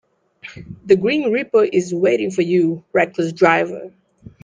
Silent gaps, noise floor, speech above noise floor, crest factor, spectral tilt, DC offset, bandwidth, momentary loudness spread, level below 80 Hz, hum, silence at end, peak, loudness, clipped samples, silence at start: none; -42 dBFS; 24 dB; 18 dB; -6 dB/octave; under 0.1%; 9.2 kHz; 19 LU; -58 dBFS; none; 0.55 s; -2 dBFS; -17 LUFS; under 0.1%; 0.45 s